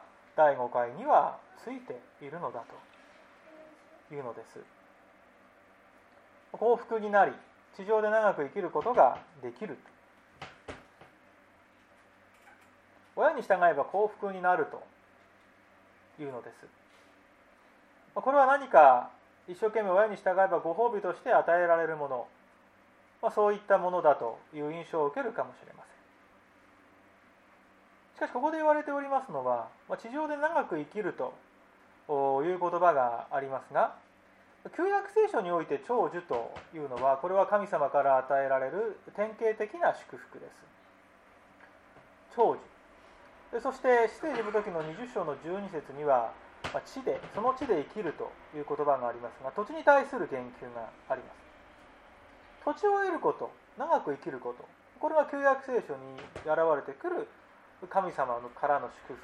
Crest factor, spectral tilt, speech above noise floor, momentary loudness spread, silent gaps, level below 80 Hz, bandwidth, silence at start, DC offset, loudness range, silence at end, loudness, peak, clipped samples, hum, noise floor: 24 dB; -6 dB/octave; 32 dB; 17 LU; none; -72 dBFS; 11 kHz; 0.35 s; under 0.1%; 11 LU; 0.05 s; -30 LUFS; -8 dBFS; under 0.1%; none; -61 dBFS